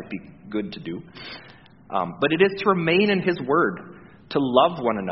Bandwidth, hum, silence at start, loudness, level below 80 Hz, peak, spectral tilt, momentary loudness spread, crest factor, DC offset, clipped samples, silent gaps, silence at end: 5.8 kHz; none; 0 s; -22 LUFS; -60 dBFS; -2 dBFS; -4 dB/octave; 18 LU; 22 dB; 0.1%; under 0.1%; none; 0 s